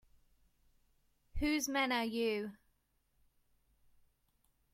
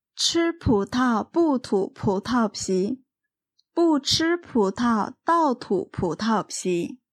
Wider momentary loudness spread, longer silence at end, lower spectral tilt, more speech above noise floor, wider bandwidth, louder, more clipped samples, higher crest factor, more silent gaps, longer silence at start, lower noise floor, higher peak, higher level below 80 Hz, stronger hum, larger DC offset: first, 12 LU vs 5 LU; first, 2.2 s vs 0.15 s; second, -3 dB/octave vs -4.5 dB/octave; second, 42 dB vs 62 dB; first, 16.5 kHz vs 14 kHz; second, -35 LUFS vs -23 LUFS; neither; about the same, 20 dB vs 16 dB; neither; first, 1.35 s vs 0.15 s; second, -78 dBFS vs -85 dBFS; second, -22 dBFS vs -8 dBFS; second, -56 dBFS vs -50 dBFS; neither; neither